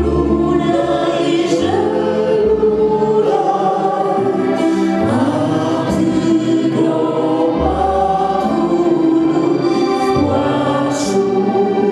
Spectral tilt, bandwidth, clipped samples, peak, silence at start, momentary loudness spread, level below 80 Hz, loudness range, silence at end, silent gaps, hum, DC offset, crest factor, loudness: -6.5 dB/octave; 11.5 kHz; under 0.1%; -2 dBFS; 0 s; 2 LU; -36 dBFS; 1 LU; 0 s; none; none; under 0.1%; 12 dB; -15 LUFS